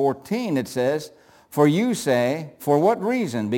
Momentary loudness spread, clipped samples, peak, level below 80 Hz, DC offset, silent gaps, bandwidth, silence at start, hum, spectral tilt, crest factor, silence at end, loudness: 9 LU; under 0.1%; -6 dBFS; -68 dBFS; under 0.1%; none; 17 kHz; 0 s; none; -6 dB/octave; 16 dB; 0 s; -22 LUFS